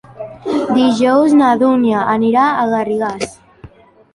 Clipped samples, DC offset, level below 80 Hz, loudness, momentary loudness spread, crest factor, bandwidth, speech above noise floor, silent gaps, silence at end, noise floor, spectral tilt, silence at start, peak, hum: under 0.1%; under 0.1%; -52 dBFS; -13 LUFS; 14 LU; 12 dB; 11.5 kHz; 28 dB; none; 0.45 s; -41 dBFS; -5.5 dB/octave; 0.15 s; -2 dBFS; none